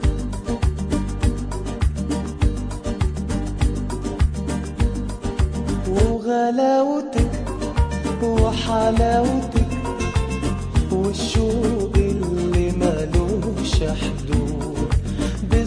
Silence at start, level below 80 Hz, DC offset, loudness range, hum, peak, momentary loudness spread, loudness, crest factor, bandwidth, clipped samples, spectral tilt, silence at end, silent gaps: 0 s; -24 dBFS; under 0.1%; 4 LU; none; -4 dBFS; 7 LU; -22 LUFS; 16 dB; 10.5 kHz; under 0.1%; -6.5 dB/octave; 0 s; none